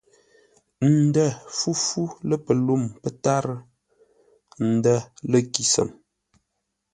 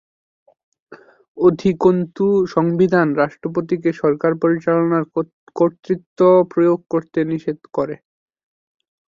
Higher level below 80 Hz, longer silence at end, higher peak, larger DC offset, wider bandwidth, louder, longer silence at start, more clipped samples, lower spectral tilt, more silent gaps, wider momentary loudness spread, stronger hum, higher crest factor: about the same, -62 dBFS vs -58 dBFS; second, 1 s vs 1.25 s; about the same, 0 dBFS vs -2 dBFS; neither; first, 11 kHz vs 7.2 kHz; second, -23 LUFS vs -18 LUFS; about the same, 0.8 s vs 0.9 s; neither; second, -5 dB/octave vs -9 dB/octave; second, none vs 1.28-1.35 s, 5.33-5.47 s, 6.06-6.16 s; about the same, 8 LU vs 10 LU; neither; first, 24 dB vs 16 dB